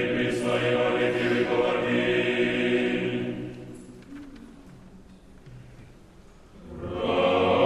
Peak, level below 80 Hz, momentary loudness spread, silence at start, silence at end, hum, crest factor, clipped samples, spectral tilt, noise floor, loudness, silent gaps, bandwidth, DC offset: -10 dBFS; -54 dBFS; 20 LU; 0 s; 0 s; none; 16 dB; under 0.1%; -6 dB/octave; -50 dBFS; -25 LUFS; none; 11.5 kHz; under 0.1%